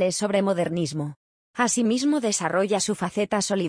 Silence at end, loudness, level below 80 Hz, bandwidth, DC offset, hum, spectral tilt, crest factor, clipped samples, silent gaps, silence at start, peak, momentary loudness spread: 0 s; -24 LUFS; -64 dBFS; 10.5 kHz; under 0.1%; none; -4 dB/octave; 16 dB; under 0.1%; 1.16-1.54 s; 0 s; -8 dBFS; 7 LU